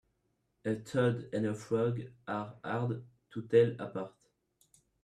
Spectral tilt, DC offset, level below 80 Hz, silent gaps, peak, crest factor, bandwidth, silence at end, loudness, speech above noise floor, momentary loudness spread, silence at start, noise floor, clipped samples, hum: -7.5 dB/octave; under 0.1%; -72 dBFS; none; -14 dBFS; 22 dB; 11 kHz; 0.95 s; -34 LUFS; 46 dB; 15 LU; 0.65 s; -78 dBFS; under 0.1%; none